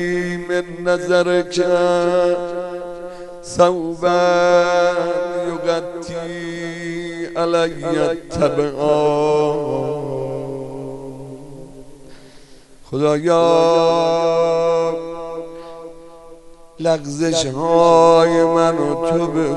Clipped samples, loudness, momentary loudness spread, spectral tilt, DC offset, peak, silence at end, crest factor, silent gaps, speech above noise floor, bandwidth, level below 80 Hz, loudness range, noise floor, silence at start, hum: under 0.1%; -17 LUFS; 17 LU; -5.5 dB/octave; under 0.1%; 0 dBFS; 0 s; 18 dB; none; 26 dB; 11 kHz; -48 dBFS; 6 LU; -42 dBFS; 0 s; none